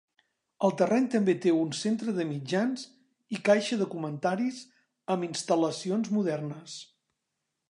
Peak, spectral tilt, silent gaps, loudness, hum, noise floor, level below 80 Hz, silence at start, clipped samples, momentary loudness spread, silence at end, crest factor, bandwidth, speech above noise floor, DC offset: -10 dBFS; -5.5 dB/octave; none; -29 LUFS; none; -83 dBFS; -80 dBFS; 0.6 s; under 0.1%; 14 LU; 0.85 s; 20 dB; 11 kHz; 55 dB; under 0.1%